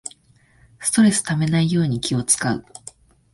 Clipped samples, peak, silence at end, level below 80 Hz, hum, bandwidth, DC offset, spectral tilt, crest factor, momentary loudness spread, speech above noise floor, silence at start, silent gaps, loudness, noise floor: under 0.1%; -4 dBFS; 0.75 s; -52 dBFS; none; 12 kHz; under 0.1%; -4.5 dB/octave; 18 dB; 18 LU; 37 dB; 0.05 s; none; -19 LUFS; -56 dBFS